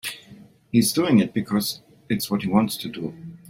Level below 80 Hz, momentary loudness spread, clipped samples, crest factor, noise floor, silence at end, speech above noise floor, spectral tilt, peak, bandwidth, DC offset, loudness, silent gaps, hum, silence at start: -58 dBFS; 14 LU; under 0.1%; 18 dB; -48 dBFS; 0 s; 26 dB; -5 dB/octave; -6 dBFS; 16.5 kHz; under 0.1%; -23 LUFS; none; none; 0.05 s